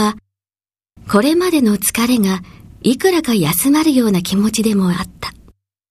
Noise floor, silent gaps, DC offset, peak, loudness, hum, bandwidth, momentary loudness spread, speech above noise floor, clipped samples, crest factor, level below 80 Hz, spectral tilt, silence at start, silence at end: under -90 dBFS; none; under 0.1%; 0 dBFS; -15 LUFS; none; 15.5 kHz; 10 LU; over 76 dB; under 0.1%; 16 dB; -46 dBFS; -4.5 dB/octave; 0 s; 0.6 s